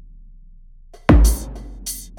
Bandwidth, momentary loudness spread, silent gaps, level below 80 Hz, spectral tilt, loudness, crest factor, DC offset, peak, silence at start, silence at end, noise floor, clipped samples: 18 kHz; 17 LU; none; -20 dBFS; -6 dB/octave; -18 LUFS; 20 dB; under 0.1%; 0 dBFS; 1.1 s; 0.15 s; -43 dBFS; under 0.1%